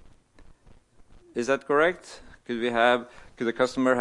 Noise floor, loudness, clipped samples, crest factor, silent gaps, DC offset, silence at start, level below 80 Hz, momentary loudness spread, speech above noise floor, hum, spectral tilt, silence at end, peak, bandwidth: -54 dBFS; -25 LUFS; under 0.1%; 20 dB; none; under 0.1%; 1.35 s; -58 dBFS; 20 LU; 29 dB; none; -4.5 dB/octave; 0 s; -6 dBFS; 11.5 kHz